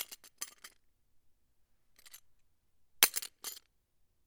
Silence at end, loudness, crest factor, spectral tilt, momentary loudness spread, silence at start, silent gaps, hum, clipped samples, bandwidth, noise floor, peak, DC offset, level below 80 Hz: 0.7 s; -32 LUFS; 38 dB; 2 dB/octave; 17 LU; 0 s; none; none; under 0.1%; over 20 kHz; -73 dBFS; -4 dBFS; under 0.1%; -78 dBFS